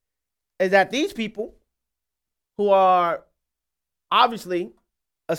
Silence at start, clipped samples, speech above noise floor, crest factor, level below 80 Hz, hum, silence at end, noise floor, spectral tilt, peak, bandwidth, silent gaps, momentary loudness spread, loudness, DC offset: 0.6 s; under 0.1%; 66 dB; 22 dB; -64 dBFS; none; 0 s; -86 dBFS; -4.5 dB/octave; -2 dBFS; 16 kHz; none; 17 LU; -21 LUFS; under 0.1%